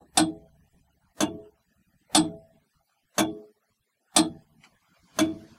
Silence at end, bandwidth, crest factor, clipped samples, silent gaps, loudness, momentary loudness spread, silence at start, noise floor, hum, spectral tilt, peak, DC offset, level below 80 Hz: 0.2 s; 16 kHz; 26 dB; under 0.1%; none; -26 LUFS; 22 LU; 0.15 s; -75 dBFS; none; -2.5 dB/octave; -4 dBFS; under 0.1%; -64 dBFS